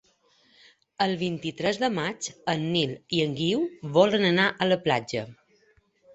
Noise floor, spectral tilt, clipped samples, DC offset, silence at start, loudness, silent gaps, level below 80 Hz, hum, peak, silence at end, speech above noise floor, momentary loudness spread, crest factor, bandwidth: -64 dBFS; -5 dB/octave; under 0.1%; under 0.1%; 1 s; -26 LUFS; none; -64 dBFS; none; -6 dBFS; 0.8 s; 39 dB; 9 LU; 20 dB; 8.4 kHz